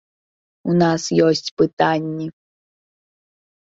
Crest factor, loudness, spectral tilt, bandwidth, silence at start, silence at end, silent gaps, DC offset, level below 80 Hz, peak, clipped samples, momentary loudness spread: 18 dB; -18 LUFS; -5.5 dB/octave; 8 kHz; 0.65 s; 1.5 s; 1.51-1.57 s, 1.73-1.77 s; under 0.1%; -60 dBFS; -2 dBFS; under 0.1%; 13 LU